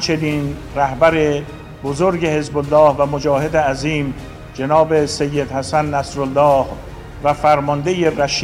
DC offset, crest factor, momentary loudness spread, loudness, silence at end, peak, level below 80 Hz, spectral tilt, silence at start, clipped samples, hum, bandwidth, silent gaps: under 0.1%; 14 dB; 12 LU; -17 LUFS; 0 s; -2 dBFS; -38 dBFS; -5.5 dB/octave; 0 s; under 0.1%; none; 15.5 kHz; none